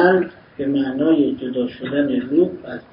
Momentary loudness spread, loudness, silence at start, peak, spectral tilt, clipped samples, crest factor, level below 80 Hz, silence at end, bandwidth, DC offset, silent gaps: 9 LU; -20 LUFS; 0 s; -2 dBFS; -11.5 dB/octave; under 0.1%; 16 dB; -56 dBFS; 0.1 s; 5.4 kHz; under 0.1%; none